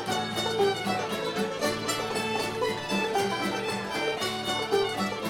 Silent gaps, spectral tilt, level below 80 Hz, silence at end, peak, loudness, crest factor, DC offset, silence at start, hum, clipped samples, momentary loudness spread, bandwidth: none; -3.5 dB/octave; -60 dBFS; 0 s; -12 dBFS; -28 LUFS; 16 dB; under 0.1%; 0 s; none; under 0.1%; 3 LU; 18 kHz